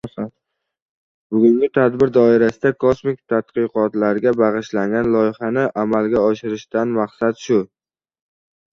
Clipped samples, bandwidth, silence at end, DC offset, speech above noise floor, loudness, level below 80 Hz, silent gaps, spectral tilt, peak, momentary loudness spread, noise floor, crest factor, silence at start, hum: under 0.1%; 7.4 kHz; 1.05 s; under 0.1%; 60 dB; -18 LUFS; -54 dBFS; 0.82-1.30 s; -7.5 dB/octave; -2 dBFS; 8 LU; -76 dBFS; 16 dB; 0.05 s; none